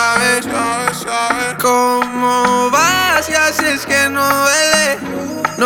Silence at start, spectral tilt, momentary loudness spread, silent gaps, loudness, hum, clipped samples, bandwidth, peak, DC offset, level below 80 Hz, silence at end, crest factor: 0 s; -2 dB/octave; 6 LU; none; -13 LUFS; none; under 0.1%; over 20 kHz; 0 dBFS; under 0.1%; -48 dBFS; 0 s; 14 dB